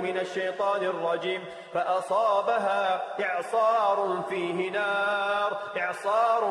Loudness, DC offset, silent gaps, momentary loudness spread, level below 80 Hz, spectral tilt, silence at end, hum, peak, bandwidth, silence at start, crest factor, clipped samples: -27 LUFS; under 0.1%; none; 6 LU; -80 dBFS; -4.5 dB/octave; 0 s; none; -12 dBFS; 12 kHz; 0 s; 14 dB; under 0.1%